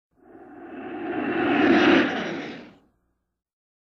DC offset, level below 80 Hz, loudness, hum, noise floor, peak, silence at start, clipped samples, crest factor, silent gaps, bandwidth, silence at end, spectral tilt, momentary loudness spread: under 0.1%; -62 dBFS; -21 LUFS; none; -73 dBFS; -6 dBFS; 0.35 s; under 0.1%; 18 dB; none; 6.8 kHz; 1.25 s; -5.5 dB/octave; 23 LU